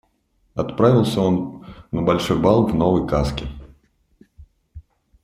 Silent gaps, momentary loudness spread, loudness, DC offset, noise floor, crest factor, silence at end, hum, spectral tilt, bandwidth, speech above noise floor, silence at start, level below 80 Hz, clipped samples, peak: none; 16 LU; -19 LUFS; under 0.1%; -64 dBFS; 18 dB; 0.45 s; none; -7.5 dB/octave; 15 kHz; 46 dB; 0.55 s; -38 dBFS; under 0.1%; -2 dBFS